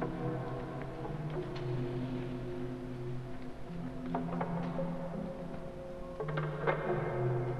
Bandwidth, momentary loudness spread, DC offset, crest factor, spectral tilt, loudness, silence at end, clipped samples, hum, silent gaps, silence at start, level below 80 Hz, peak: 11 kHz; 10 LU; under 0.1%; 20 dB; -8.5 dB/octave; -39 LUFS; 0 s; under 0.1%; none; none; 0 s; -50 dBFS; -16 dBFS